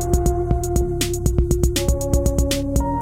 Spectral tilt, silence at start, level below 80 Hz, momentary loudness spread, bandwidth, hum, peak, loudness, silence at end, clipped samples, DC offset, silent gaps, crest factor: -5.5 dB/octave; 0 s; -22 dBFS; 2 LU; 16.5 kHz; none; -4 dBFS; -20 LUFS; 0 s; under 0.1%; under 0.1%; none; 16 dB